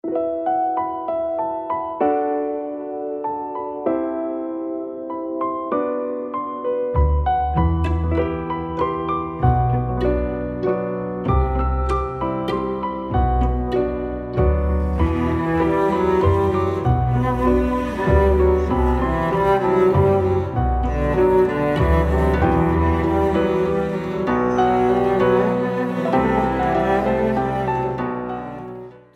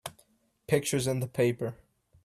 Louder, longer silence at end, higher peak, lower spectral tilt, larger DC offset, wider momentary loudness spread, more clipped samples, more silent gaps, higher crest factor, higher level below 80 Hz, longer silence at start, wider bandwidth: first, -20 LUFS vs -30 LUFS; second, 0.2 s vs 0.5 s; first, -4 dBFS vs -10 dBFS; first, -9 dB/octave vs -5 dB/octave; neither; about the same, 9 LU vs 10 LU; neither; neither; about the same, 16 dB vs 20 dB; first, -28 dBFS vs -64 dBFS; about the same, 0.05 s vs 0.05 s; second, 8.4 kHz vs 14.5 kHz